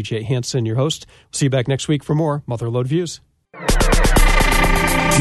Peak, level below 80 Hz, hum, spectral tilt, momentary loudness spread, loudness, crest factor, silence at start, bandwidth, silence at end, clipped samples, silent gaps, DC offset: -2 dBFS; -22 dBFS; none; -4.5 dB/octave; 9 LU; -18 LUFS; 14 dB; 0 s; 12.5 kHz; 0 s; under 0.1%; none; under 0.1%